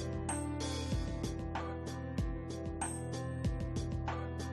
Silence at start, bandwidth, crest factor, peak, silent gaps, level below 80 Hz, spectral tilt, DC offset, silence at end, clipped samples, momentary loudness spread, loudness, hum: 0 s; 12.5 kHz; 14 dB; -24 dBFS; none; -46 dBFS; -5.5 dB/octave; under 0.1%; 0 s; under 0.1%; 3 LU; -39 LUFS; none